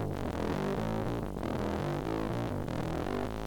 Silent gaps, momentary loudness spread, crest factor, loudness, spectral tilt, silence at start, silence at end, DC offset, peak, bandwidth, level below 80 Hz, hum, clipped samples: none; 2 LU; 14 dB; -35 LUFS; -7 dB/octave; 0 s; 0 s; under 0.1%; -20 dBFS; 20 kHz; -46 dBFS; none; under 0.1%